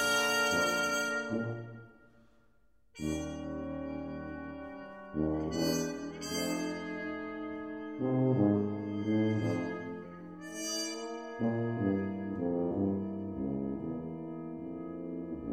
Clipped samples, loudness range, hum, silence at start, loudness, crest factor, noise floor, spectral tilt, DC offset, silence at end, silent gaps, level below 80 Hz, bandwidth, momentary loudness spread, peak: under 0.1%; 6 LU; none; 0 s; -34 LUFS; 20 dB; -71 dBFS; -5 dB/octave; under 0.1%; 0 s; none; -58 dBFS; 16 kHz; 13 LU; -14 dBFS